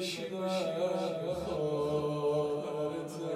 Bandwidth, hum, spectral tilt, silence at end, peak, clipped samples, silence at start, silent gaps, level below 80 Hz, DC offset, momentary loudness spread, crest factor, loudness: 15 kHz; none; -5.5 dB/octave; 0 s; -20 dBFS; under 0.1%; 0 s; none; -64 dBFS; under 0.1%; 5 LU; 12 dB; -34 LUFS